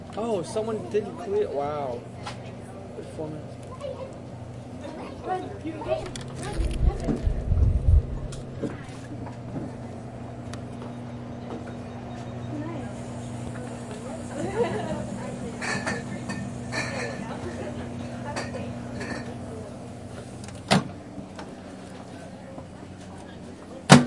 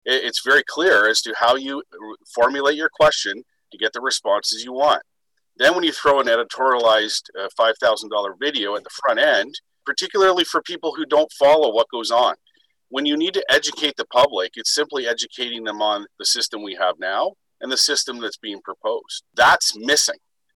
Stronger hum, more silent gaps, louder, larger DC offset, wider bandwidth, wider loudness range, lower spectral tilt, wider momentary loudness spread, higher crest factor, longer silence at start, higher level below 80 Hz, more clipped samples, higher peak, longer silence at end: neither; neither; second, -31 LUFS vs -19 LUFS; neither; second, 11.5 kHz vs 19 kHz; first, 9 LU vs 3 LU; first, -5.5 dB/octave vs -1 dB/octave; about the same, 13 LU vs 12 LU; first, 28 dB vs 14 dB; about the same, 0 s vs 0.05 s; first, -36 dBFS vs -60 dBFS; neither; first, 0 dBFS vs -8 dBFS; second, 0 s vs 0.4 s